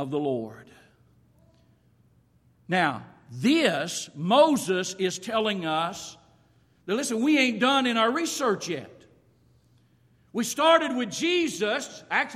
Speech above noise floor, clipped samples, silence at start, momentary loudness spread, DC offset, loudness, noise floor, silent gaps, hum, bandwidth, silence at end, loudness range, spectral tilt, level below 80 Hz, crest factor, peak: 37 dB; under 0.1%; 0 s; 13 LU; under 0.1%; -25 LUFS; -62 dBFS; none; none; 15.5 kHz; 0 s; 4 LU; -3.5 dB/octave; -70 dBFS; 20 dB; -6 dBFS